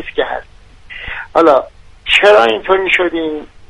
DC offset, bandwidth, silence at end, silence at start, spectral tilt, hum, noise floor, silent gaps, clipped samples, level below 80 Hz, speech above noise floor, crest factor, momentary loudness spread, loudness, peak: under 0.1%; 11 kHz; 0.2 s; 0 s; -3.5 dB/octave; none; -39 dBFS; none; under 0.1%; -40 dBFS; 28 dB; 14 dB; 20 LU; -12 LUFS; 0 dBFS